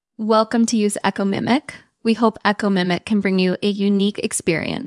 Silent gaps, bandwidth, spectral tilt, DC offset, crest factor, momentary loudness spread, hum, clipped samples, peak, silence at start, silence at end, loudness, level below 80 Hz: none; 12 kHz; -5 dB/octave; under 0.1%; 20 dB; 4 LU; none; under 0.1%; 0 dBFS; 0.2 s; 0 s; -19 LUFS; -60 dBFS